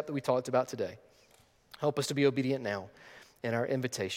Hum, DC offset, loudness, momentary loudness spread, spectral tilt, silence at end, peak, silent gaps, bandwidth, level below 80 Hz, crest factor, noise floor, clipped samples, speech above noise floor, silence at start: none; under 0.1%; -32 LUFS; 12 LU; -5 dB/octave; 0 s; -14 dBFS; none; 16.5 kHz; -74 dBFS; 20 dB; -58 dBFS; under 0.1%; 26 dB; 0 s